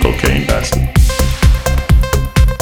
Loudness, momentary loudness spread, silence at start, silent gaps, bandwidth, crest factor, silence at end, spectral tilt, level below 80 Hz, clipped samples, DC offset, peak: -13 LUFS; 2 LU; 0 s; none; 19.5 kHz; 12 dB; 0 s; -5 dB/octave; -14 dBFS; under 0.1%; under 0.1%; 0 dBFS